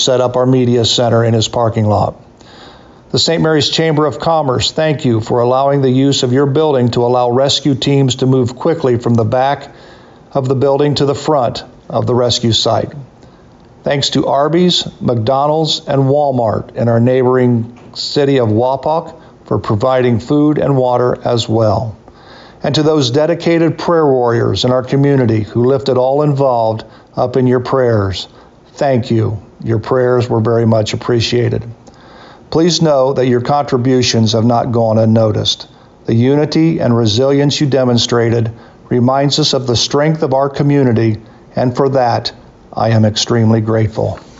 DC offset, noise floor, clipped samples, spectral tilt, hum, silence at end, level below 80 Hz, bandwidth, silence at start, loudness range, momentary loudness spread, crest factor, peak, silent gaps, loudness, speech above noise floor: under 0.1%; -41 dBFS; under 0.1%; -6 dB/octave; none; 0.2 s; -44 dBFS; 8 kHz; 0 s; 2 LU; 7 LU; 10 dB; -2 dBFS; none; -13 LUFS; 29 dB